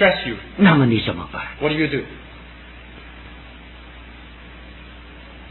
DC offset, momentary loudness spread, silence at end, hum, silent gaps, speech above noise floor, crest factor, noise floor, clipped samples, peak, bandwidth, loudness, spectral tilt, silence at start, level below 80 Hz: under 0.1%; 25 LU; 0 s; none; none; 22 dB; 20 dB; -40 dBFS; under 0.1%; -2 dBFS; 4.3 kHz; -19 LUFS; -10 dB/octave; 0 s; -42 dBFS